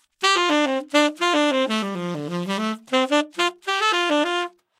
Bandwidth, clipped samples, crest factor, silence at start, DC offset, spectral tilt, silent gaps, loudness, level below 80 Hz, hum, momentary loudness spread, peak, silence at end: 15 kHz; under 0.1%; 18 dB; 0.2 s; under 0.1%; -3.5 dB/octave; none; -21 LUFS; -80 dBFS; none; 8 LU; -4 dBFS; 0.3 s